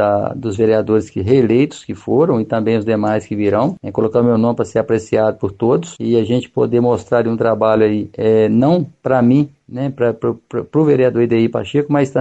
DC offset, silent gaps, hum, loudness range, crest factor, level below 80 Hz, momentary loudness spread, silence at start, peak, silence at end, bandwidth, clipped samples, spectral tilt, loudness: under 0.1%; none; none; 2 LU; 14 dB; -52 dBFS; 6 LU; 0 s; -2 dBFS; 0 s; 8.6 kHz; under 0.1%; -8 dB/octave; -15 LUFS